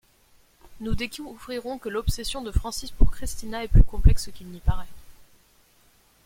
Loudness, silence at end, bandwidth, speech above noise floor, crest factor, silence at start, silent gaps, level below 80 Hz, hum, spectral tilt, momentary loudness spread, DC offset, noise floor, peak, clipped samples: -28 LUFS; 1.15 s; 16 kHz; 38 dB; 20 dB; 0.7 s; none; -26 dBFS; none; -5.5 dB/octave; 15 LU; under 0.1%; -60 dBFS; -2 dBFS; under 0.1%